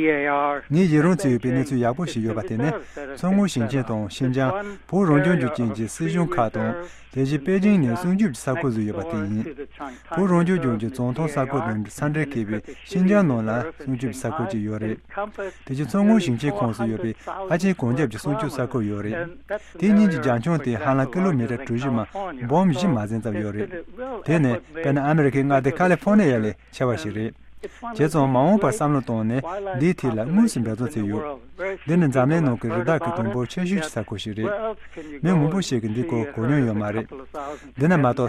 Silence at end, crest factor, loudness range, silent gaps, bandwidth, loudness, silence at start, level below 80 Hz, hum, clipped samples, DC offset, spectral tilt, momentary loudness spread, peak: 0 s; 16 dB; 3 LU; none; 13 kHz; -23 LUFS; 0 s; -50 dBFS; none; under 0.1%; under 0.1%; -7 dB/octave; 12 LU; -6 dBFS